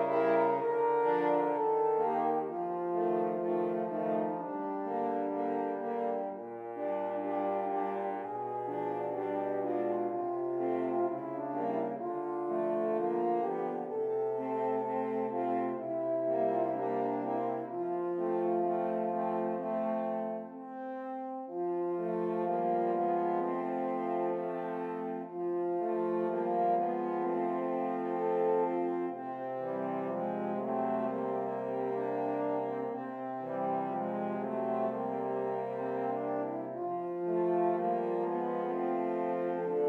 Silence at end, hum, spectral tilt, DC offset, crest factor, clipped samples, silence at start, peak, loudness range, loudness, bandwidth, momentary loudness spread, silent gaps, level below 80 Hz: 0 s; none; -9.5 dB/octave; under 0.1%; 16 dB; under 0.1%; 0 s; -18 dBFS; 3 LU; -33 LUFS; 4.2 kHz; 7 LU; none; under -90 dBFS